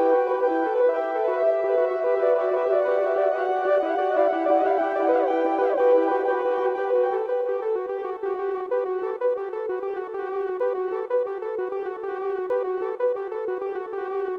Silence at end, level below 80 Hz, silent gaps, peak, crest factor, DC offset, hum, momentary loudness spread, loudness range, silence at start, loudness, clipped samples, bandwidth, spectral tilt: 0 s; -72 dBFS; none; -8 dBFS; 14 dB; under 0.1%; none; 8 LU; 6 LU; 0 s; -24 LUFS; under 0.1%; 5.4 kHz; -5.5 dB/octave